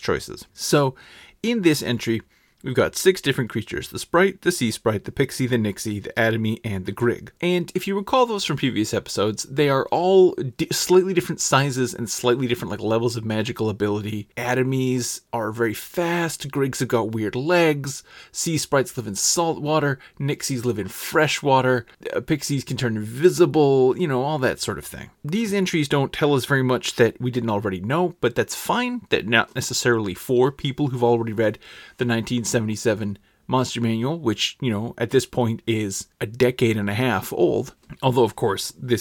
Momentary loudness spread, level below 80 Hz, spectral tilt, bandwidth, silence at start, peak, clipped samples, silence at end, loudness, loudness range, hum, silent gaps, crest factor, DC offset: 9 LU; -54 dBFS; -4.5 dB/octave; 19 kHz; 0 s; -2 dBFS; under 0.1%; 0 s; -22 LUFS; 4 LU; none; none; 20 dB; under 0.1%